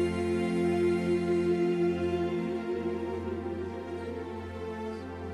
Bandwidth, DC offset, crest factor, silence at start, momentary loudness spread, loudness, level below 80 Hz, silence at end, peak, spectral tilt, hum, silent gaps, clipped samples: 10.5 kHz; under 0.1%; 14 dB; 0 s; 11 LU; -31 LUFS; -60 dBFS; 0 s; -18 dBFS; -7.5 dB/octave; none; none; under 0.1%